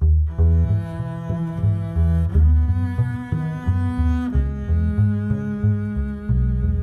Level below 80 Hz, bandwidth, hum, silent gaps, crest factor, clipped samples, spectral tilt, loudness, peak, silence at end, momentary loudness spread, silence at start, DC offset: -24 dBFS; 3.7 kHz; none; none; 12 dB; under 0.1%; -10 dB/octave; -21 LUFS; -6 dBFS; 0 s; 8 LU; 0 s; under 0.1%